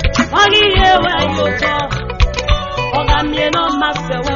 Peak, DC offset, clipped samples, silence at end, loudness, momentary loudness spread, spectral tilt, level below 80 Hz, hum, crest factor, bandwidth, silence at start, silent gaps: 0 dBFS; under 0.1%; under 0.1%; 0 s; -13 LUFS; 8 LU; -2.5 dB/octave; -22 dBFS; none; 14 dB; 7.4 kHz; 0 s; none